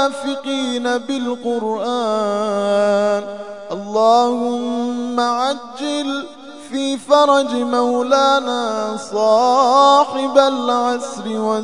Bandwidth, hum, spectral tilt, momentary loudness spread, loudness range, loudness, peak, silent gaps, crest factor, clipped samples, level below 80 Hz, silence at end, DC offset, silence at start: 11 kHz; none; -4 dB/octave; 11 LU; 4 LU; -17 LUFS; 0 dBFS; none; 16 dB; under 0.1%; -70 dBFS; 0 s; 0.4%; 0 s